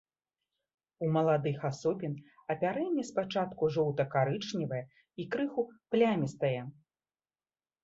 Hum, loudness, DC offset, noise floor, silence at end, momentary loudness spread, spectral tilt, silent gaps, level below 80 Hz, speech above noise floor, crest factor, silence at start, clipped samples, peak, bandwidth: none; -32 LUFS; under 0.1%; under -90 dBFS; 1.1 s; 11 LU; -7 dB/octave; none; -72 dBFS; over 58 dB; 18 dB; 1 s; under 0.1%; -16 dBFS; 8 kHz